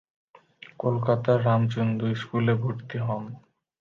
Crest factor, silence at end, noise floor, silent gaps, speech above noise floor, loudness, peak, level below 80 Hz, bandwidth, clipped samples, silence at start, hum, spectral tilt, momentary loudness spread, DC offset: 18 dB; 0.4 s; -51 dBFS; none; 26 dB; -26 LUFS; -8 dBFS; -62 dBFS; 7 kHz; under 0.1%; 0.8 s; none; -9 dB/octave; 9 LU; under 0.1%